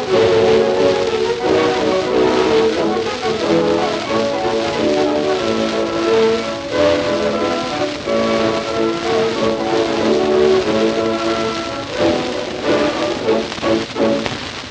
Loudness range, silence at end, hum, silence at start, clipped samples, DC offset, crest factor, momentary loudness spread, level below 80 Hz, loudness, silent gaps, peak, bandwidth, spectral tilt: 2 LU; 0 s; none; 0 s; under 0.1%; under 0.1%; 14 dB; 5 LU; -44 dBFS; -16 LUFS; none; -2 dBFS; 9.4 kHz; -4.5 dB/octave